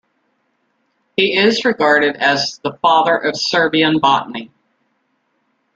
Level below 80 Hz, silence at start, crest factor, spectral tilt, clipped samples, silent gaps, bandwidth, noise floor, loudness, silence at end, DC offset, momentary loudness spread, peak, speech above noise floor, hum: -62 dBFS; 1.2 s; 16 dB; -4 dB/octave; under 0.1%; none; 9 kHz; -66 dBFS; -14 LUFS; 1.3 s; under 0.1%; 7 LU; 0 dBFS; 51 dB; none